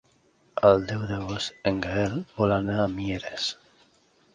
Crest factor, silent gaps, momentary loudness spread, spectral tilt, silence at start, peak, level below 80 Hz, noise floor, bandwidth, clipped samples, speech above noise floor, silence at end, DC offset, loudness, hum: 22 dB; none; 11 LU; -6 dB/octave; 0.55 s; -4 dBFS; -50 dBFS; -63 dBFS; 9.6 kHz; under 0.1%; 38 dB; 0.8 s; under 0.1%; -26 LUFS; none